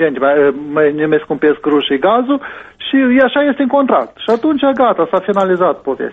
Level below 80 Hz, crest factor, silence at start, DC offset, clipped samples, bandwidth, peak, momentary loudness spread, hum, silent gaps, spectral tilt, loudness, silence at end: -54 dBFS; 12 dB; 0 s; under 0.1%; under 0.1%; 7.2 kHz; 0 dBFS; 5 LU; none; none; -7 dB/octave; -13 LUFS; 0 s